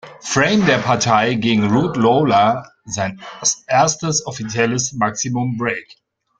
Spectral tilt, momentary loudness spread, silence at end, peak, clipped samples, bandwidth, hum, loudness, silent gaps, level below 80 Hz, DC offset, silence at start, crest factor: -4 dB/octave; 9 LU; 0.45 s; -2 dBFS; under 0.1%; 10 kHz; none; -17 LUFS; none; -52 dBFS; under 0.1%; 0.05 s; 16 dB